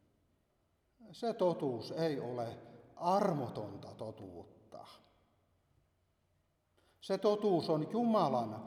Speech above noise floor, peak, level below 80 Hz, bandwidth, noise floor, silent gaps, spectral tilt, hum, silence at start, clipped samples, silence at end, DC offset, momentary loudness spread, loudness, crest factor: 42 dB; -18 dBFS; -78 dBFS; 14.5 kHz; -77 dBFS; none; -7 dB/octave; none; 1 s; under 0.1%; 0 s; under 0.1%; 21 LU; -35 LUFS; 20 dB